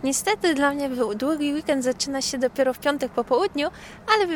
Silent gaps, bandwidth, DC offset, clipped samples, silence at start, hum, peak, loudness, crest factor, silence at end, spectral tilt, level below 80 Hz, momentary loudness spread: none; 19 kHz; under 0.1%; under 0.1%; 0 s; none; -2 dBFS; -24 LUFS; 22 dB; 0 s; -2.5 dB/octave; -54 dBFS; 4 LU